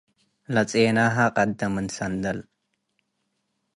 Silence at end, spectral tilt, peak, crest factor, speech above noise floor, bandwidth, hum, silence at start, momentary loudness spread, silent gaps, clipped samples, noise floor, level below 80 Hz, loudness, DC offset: 1.35 s; -5.5 dB/octave; -8 dBFS; 18 dB; 53 dB; 11.5 kHz; none; 0.5 s; 9 LU; none; under 0.1%; -76 dBFS; -56 dBFS; -23 LUFS; under 0.1%